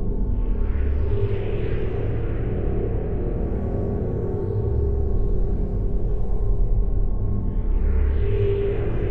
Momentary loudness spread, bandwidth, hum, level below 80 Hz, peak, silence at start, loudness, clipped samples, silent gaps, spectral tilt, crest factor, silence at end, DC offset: 4 LU; 3.6 kHz; none; -24 dBFS; -10 dBFS; 0 s; -26 LUFS; under 0.1%; none; -11 dB/octave; 12 dB; 0 s; under 0.1%